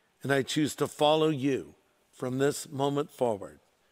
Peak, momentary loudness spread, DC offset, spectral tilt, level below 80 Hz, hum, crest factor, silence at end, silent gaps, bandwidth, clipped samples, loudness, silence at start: -10 dBFS; 10 LU; under 0.1%; -5 dB/octave; -70 dBFS; none; 20 dB; 0.4 s; none; 16 kHz; under 0.1%; -29 LUFS; 0.25 s